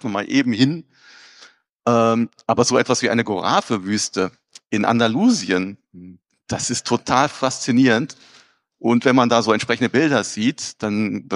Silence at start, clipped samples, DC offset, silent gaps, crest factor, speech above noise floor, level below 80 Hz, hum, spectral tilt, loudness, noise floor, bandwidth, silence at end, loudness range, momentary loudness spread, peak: 0.05 s; under 0.1%; under 0.1%; 1.72-1.80 s; 18 dB; 31 dB; -60 dBFS; none; -4.5 dB/octave; -19 LUFS; -50 dBFS; 11.5 kHz; 0 s; 3 LU; 9 LU; -2 dBFS